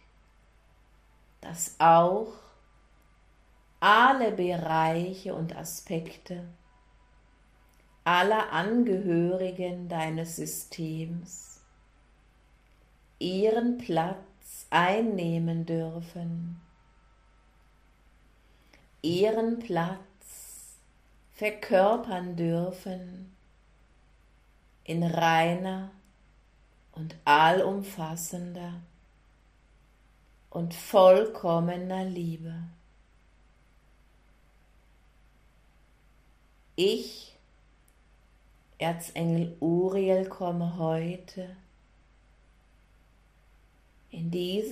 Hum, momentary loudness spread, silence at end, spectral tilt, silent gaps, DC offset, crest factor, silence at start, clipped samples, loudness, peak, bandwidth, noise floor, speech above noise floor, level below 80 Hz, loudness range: none; 21 LU; 0 s; -5.5 dB/octave; none; under 0.1%; 22 dB; 1.4 s; under 0.1%; -27 LUFS; -8 dBFS; 15.5 kHz; -61 dBFS; 34 dB; -62 dBFS; 11 LU